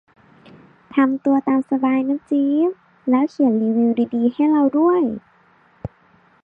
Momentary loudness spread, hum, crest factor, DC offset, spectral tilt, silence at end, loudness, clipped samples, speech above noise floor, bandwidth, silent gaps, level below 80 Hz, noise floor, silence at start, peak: 13 LU; none; 14 dB; under 0.1%; -9 dB/octave; 0.55 s; -19 LUFS; under 0.1%; 38 dB; 5.2 kHz; none; -56 dBFS; -55 dBFS; 0.95 s; -6 dBFS